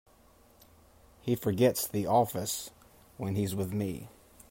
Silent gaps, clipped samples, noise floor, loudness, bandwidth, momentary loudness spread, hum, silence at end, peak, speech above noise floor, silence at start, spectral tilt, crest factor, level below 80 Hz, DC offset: none; under 0.1%; -61 dBFS; -31 LUFS; 16.5 kHz; 15 LU; none; 0.4 s; -12 dBFS; 31 dB; 1.25 s; -5.5 dB/octave; 20 dB; -64 dBFS; under 0.1%